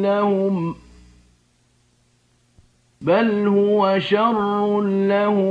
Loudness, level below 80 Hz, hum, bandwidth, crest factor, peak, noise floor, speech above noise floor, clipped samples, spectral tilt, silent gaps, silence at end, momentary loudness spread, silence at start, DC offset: -19 LUFS; -58 dBFS; none; 7 kHz; 16 dB; -6 dBFS; -61 dBFS; 43 dB; under 0.1%; -8 dB/octave; none; 0 s; 7 LU; 0 s; under 0.1%